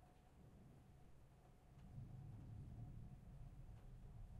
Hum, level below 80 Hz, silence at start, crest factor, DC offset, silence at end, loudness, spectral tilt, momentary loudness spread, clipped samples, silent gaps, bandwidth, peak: none; -64 dBFS; 0 s; 14 dB; under 0.1%; 0 s; -61 LUFS; -8 dB/octave; 11 LU; under 0.1%; none; 12 kHz; -46 dBFS